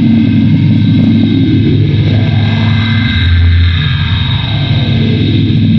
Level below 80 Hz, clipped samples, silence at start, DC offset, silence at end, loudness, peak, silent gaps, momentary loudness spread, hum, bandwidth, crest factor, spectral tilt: -26 dBFS; under 0.1%; 0 s; under 0.1%; 0 s; -9 LUFS; 0 dBFS; none; 3 LU; none; 6 kHz; 8 dB; -8.5 dB/octave